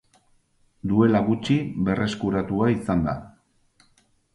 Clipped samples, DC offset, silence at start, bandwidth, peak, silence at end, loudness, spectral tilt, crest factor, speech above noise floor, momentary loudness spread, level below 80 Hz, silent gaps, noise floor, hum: under 0.1%; under 0.1%; 0.85 s; 11.5 kHz; -6 dBFS; 1.05 s; -23 LUFS; -7.5 dB/octave; 18 dB; 41 dB; 8 LU; -48 dBFS; none; -63 dBFS; none